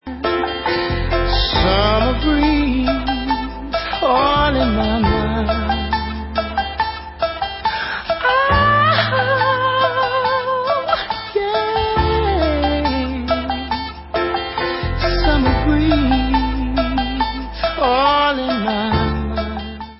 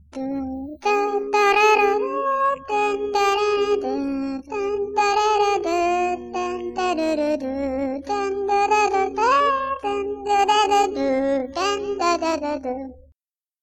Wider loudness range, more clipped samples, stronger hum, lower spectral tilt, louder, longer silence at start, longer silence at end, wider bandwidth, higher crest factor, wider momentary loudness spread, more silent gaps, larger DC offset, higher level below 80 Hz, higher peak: about the same, 3 LU vs 3 LU; neither; neither; first, -10 dB/octave vs -3 dB/octave; first, -18 LUFS vs -21 LUFS; about the same, 0.05 s vs 0.15 s; second, 0.05 s vs 0.65 s; second, 5.8 kHz vs 13 kHz; about the same, 16 dB vs 16 dB; about the same, 8 LU vs 10 LU; neither; neither; first, -26 dBFS vs -52 dBFS; first, -2 dBFS vs -6 dBFS